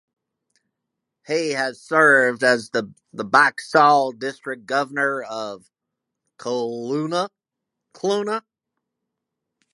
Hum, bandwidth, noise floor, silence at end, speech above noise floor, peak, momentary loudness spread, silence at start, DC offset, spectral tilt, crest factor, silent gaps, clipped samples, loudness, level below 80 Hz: none; 11.5 kHz; -83 dBFS; 1.35 s; 63 dB; 0 dBFS; 16 LU; 1.3 s; under 0.1%; -4 dB/octave; 22 dB; none; under 0.1%; -20 LUFS; -76 dBFS